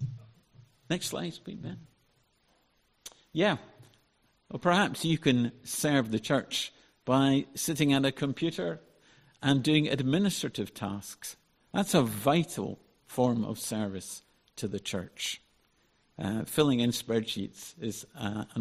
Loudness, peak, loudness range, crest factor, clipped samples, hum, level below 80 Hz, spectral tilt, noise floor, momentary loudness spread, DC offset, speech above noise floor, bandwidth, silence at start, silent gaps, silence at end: -30 LUFS; -10 dBFS; 7 LU; 22 dB; under 0.1%; none; -64 dBFS; -5 dB/octave; -70 dBFS; 16 LU; under 0.1%; 41 dB; 15 kHz; 0 s; none; 0 s